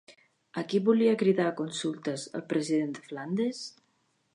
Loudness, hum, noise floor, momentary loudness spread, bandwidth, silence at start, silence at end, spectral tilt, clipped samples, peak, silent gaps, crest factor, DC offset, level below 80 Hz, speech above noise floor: -29 LUFS; none; -73 dBFS; 14 LU; 11 kHz; 0.1 s; 0.65 s; -5.5 dB/octave; under 0.1%; -12 dBFS; none; 18 dB; under 0.1%; -82 dBFS; 44 dB